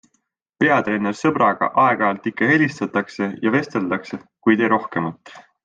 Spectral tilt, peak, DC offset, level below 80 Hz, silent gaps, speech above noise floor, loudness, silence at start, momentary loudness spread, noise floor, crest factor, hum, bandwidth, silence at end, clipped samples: -6.5 dB/octave; -2 dBFS; under 0.1%; -64 dBFS; none; 51 dB; -19 LUFS; 0.6 s; 9 LU; -70 dBFS; 18 dB; none; 7.8 kHz; 0.25 s; under 0.1%